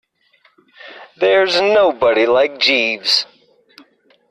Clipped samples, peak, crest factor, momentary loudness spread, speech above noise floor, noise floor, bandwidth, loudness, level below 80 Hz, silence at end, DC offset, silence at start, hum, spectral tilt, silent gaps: under 0.1%; -4 dBFS; 14 dB; 3 LU; 43 dB; -57 dBFS; 12.5 kHz; -14 LUFS; -60 dBFS; 1.05 s; under 0.1%; 0.85 s; none; -2.5 dB/octave; none